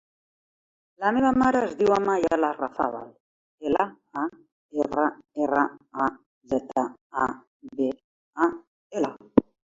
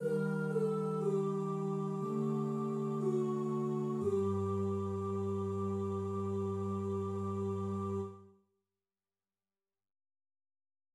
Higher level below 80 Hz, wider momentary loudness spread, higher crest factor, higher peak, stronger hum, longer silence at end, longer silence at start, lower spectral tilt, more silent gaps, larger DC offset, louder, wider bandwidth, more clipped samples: first, -58 dBFS vs -80 dBFS; first, 13 LU vs 3 LU; first, 24 dB vs 14 dB; first, -2 dBFS vs -22 dBFS; neither; second, 0.3 s vs 2.65 s; first, 1 s vs 0 s; second, -6.5 dB/octave vs -9 dB/octave; first, 3.20-3.58 s, 4.52-4.69 s, 6.26-6.41 s, 7.01-7.10 s, 7.47-7.60 s, 8.04-8.33 s, 8.67-8.90 s vs none; neither; first, -26 LUFS vs -36 LUFS; second, 7.8 kHz vs 12 kHz; neither